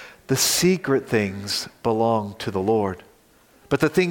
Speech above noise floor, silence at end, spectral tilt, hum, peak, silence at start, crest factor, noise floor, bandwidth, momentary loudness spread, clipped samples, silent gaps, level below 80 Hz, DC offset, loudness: 34 dB; 0 s; -4 dB/octave; none; -6 dBFS; 0 s; 16 dB; -56 dBFS; 17 kHz; 8 LU; under 0.1%; none; -56 dBFS; under 0.1%; -22 LUFS